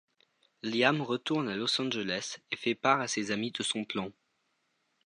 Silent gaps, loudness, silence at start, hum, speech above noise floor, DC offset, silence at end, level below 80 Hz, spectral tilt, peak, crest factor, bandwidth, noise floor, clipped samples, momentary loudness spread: none; -31 LUFS; 0.65 s; none; 46 dB; under 0.1%; 0.95 s; -74 dBFS; -3.5 dB/octave; -10 dBFS; 22 dB; 11 kHz; -77 dBFS; under 0.1%; 9 LU